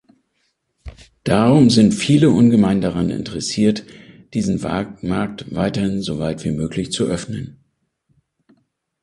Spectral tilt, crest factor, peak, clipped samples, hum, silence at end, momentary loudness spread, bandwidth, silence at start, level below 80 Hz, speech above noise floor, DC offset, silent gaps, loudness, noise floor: -6 dB/octave; 18 dB; 0 dBFS; under 0.1%; none; 1.5 s; 13 LU; 11.5 kHz; 0.85 s; -44 dBFS; 52 dB; under 0.1%; none; -18 LUFS; -68 dBFS